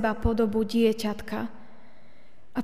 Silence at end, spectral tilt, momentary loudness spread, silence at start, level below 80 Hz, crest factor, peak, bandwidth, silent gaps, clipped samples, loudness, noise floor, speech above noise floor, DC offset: 0 s; -6.5 dB/octave; 11 LU; 0 s; -42 dBFS; 18 dB; -10 dBFS; 15.5 kHz; none; under 0.1%; -27 LUFS; -59 dBFS; 33 dB; 1%